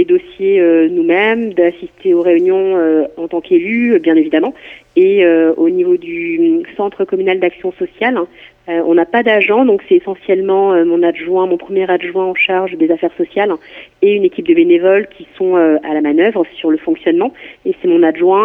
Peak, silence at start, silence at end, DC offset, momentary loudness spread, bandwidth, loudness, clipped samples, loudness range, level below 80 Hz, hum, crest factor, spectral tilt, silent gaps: 0 dBFS; 0 s; 0 s; under 0.1%; 8 LU; 3.7 kHz; -13 LUFS; under 0.1%; 2 LU; -58 dBFS; none; 12 dB; -8 dB/octave; none